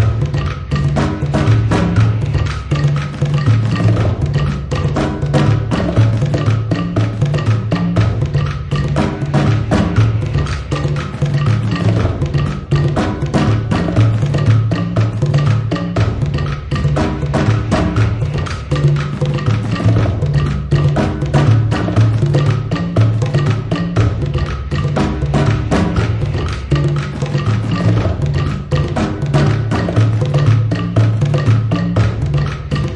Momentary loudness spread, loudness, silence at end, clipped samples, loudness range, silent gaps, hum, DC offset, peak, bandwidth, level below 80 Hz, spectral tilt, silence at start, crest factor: 5 LU; -15 LUFS; 0 s; under 0.1%; 2 LU; none; none; under 0.1%; 0 dBFS; 9.4 kHz; -28 dBFS; -7.5 dB/octave; 0 s; 14 dB